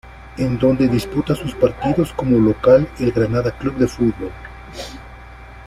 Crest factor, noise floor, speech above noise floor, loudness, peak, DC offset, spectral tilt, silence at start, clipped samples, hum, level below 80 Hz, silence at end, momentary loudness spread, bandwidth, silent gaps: 16 dB; -38 dBFS; 21 dB; -18 LUFS; -2 dBFS; under 0.1%; -7.5 dB/octave; 0.05 s; under 0.1%; none; -38 dBFS; 0 s; 18 LU; 14.5 kHz; none